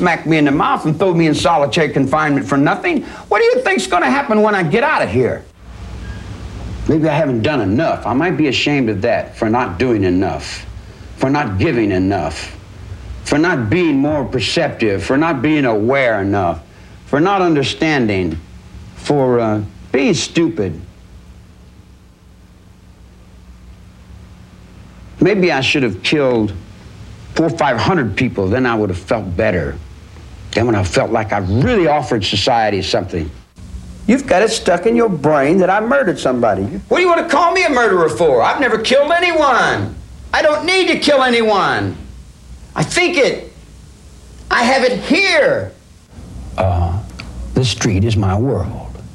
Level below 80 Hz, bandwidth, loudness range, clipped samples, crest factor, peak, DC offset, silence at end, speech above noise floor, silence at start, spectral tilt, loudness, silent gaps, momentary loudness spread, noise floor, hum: -38 dBFS; 12.5 kHz; 5 LU; under 0.1%; 16 dB; 0 dBFS; under 0.1%; 0 s; 29 dB; 0 s; -5.5 dB/octave; -15 LUFS; none; 15 LU; -43 dBFS; none